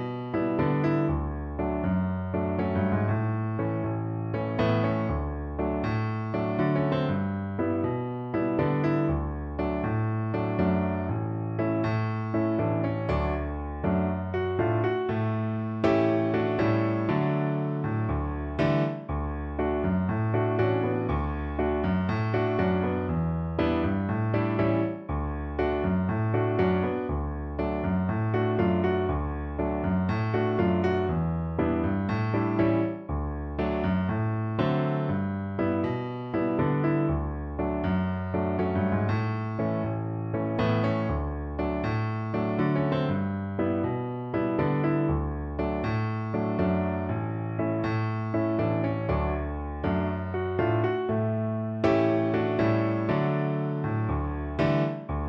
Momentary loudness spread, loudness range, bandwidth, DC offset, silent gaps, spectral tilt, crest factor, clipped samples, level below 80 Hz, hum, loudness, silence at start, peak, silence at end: 6 LU; 2 LU; 6 kHz; under 0.1%; none; -10 dB/octave; 16 dB; under 0.1%; -40 dBFS; none; -28 LUFS; 0 s; -10 dBFS; 0 s